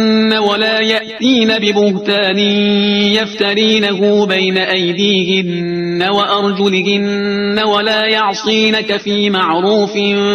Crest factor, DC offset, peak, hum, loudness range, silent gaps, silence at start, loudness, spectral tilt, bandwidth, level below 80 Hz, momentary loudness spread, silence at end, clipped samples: 12 dB; under 0.1%; 0 dBFS; none; 2 LU; none; 0 s; -12 LUFS; -5 dB/octave; 7.8 kHz; -54 dBFS; 3 LU; 0 s; under 0.1%